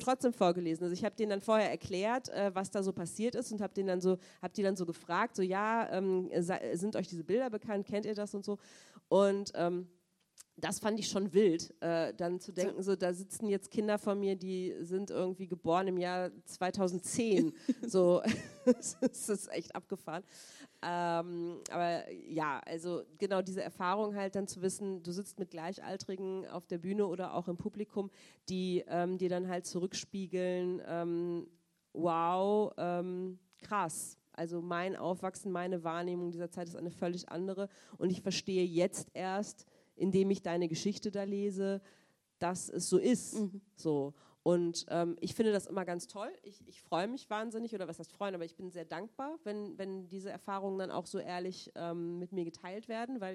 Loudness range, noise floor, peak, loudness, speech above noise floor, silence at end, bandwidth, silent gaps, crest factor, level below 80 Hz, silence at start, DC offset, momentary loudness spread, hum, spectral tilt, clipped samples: 6 LU; -64 dBFS; -14 dBFS; -36 LUFS; 28 dB; 0 s; 14 kHz; none; 22 dB; -78 dBFS; 0 s; under 0.1%; 11 LU; none; -5 dB/octave; under 0.1%